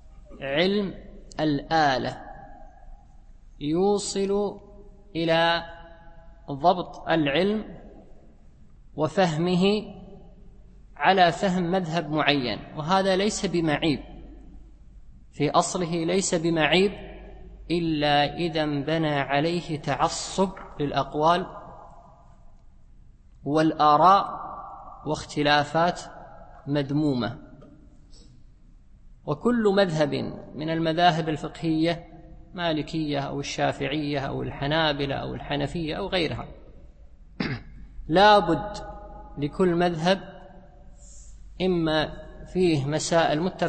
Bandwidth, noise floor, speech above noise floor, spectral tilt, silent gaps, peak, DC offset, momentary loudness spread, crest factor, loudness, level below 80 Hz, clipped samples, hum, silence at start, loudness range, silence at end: 8.8 kHz; -51 dBFS; 27 dB; -5 dB/octave; none; -4 dBFS; under 0.1%; 17 LU; 22 dB; -24 LUFS; -48 dBFS; under 0.1%; none; 0.05 s; 5 LU; 0 s